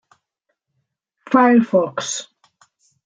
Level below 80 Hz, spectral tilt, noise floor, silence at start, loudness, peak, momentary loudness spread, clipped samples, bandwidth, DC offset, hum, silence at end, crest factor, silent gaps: -70 dBFS; -4.5 dB/octave; -75 dBFS; 1.3 s; -17 LUFS; -2 dBFS; 13 LU; under 0.1%; 9.4 kHz; under 0.1%; none; 0.85 s; 18 dB; none